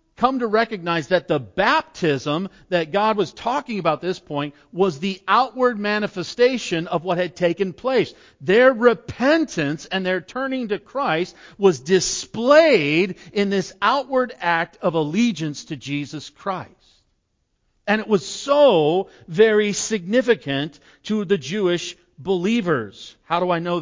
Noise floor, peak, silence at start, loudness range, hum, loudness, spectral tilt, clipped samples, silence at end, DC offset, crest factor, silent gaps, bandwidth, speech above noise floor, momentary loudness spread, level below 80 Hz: -70 dBFS; -2 dBFS; 0.2 s; 5 LU; none; -20 LUFS; -4.5 dB/octave; under 0.1%; 0 s; under 0.1%; 20 dB; none; 7.6 kHz; 50 dB; 12 LU; -58 dBFS